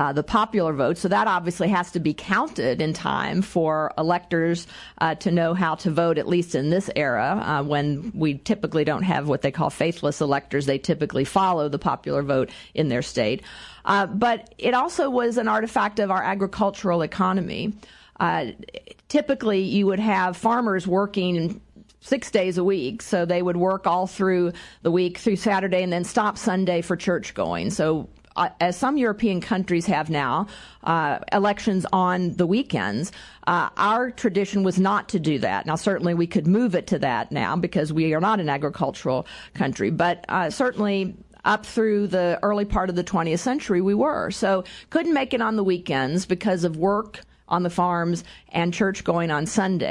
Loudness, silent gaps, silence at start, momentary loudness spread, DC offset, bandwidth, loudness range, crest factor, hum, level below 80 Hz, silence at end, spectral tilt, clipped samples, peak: -23 LUFS; none; 0 s; 5 LU; under 0.1%; 11.5 kHz; 1 LU; 18 dB; none; -50 dBFS; 0 s; -6 dB/octave; under 0.1%; -6 dBFS